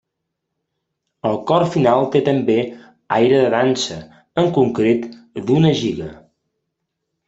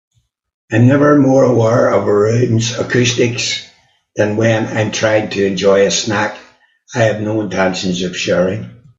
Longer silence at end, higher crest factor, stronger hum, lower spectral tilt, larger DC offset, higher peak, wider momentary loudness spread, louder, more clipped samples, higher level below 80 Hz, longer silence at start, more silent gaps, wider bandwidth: first, 1.15 s vs 0.25 s; about the same, 16 dB vs 14 dB; neither; first, -6.5 dB/octave vs -5 dB/octave; neither; about the same, -2 dBFS vs 0 dBFS; first, 13 LU vs 8 LU; second, -17 LUFS vs -14 LUFS; neither; about the same, -54 dBFS vs -52 dBFS; first, 1.25 s vs 0.7 s; neither; about the same, 8 kHz vs 7.8 kHz